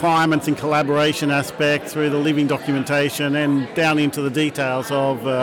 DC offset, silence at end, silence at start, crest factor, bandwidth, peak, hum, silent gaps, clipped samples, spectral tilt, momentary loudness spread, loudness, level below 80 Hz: under 0.1%; 0 s; 0 s; 10 dB; 17.5 kHz; -8 dBFS; none; none; under 0.1%; -5.5 dB/octave; 3 LU; -19 LUFS; -60 dBFS